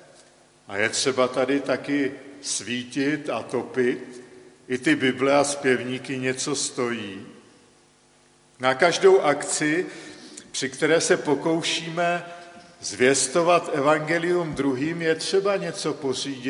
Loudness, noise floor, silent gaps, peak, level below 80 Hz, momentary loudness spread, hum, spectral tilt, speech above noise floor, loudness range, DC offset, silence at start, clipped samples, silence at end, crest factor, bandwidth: -23 LUFS; -58 dBFS; none; -4 dBFS; -66 dBFS; 13 LU; none; -3.5 dB/octave; 35 dB; 4 LU; under 0.1%; 0.7 s; under 0.1%; 0 s; 20 dB; 11.5 kHz